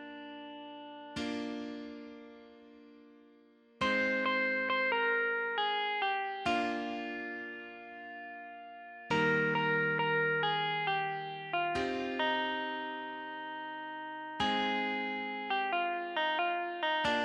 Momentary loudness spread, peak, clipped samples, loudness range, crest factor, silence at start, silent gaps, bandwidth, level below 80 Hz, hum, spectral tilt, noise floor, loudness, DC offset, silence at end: 17 LU; -18 dBFS; under 0.1%; 6 LU; 16 dB; 0 s; none; 11 kHz; -68 dBFS; none; -5 dB/octave; -62 dBFS; -33 LUFS; under 0.1%; 0 s